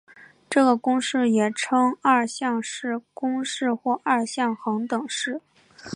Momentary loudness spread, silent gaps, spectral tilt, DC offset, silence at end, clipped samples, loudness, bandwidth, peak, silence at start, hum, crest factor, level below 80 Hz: 9 LU; none; -3.5 dB/octave; under 0.1%; 0 s; under 0.1%; -23 LUFS; 11 kHz; -6 dBFS; 0.2 s; none; 18 dB; -74 dBFS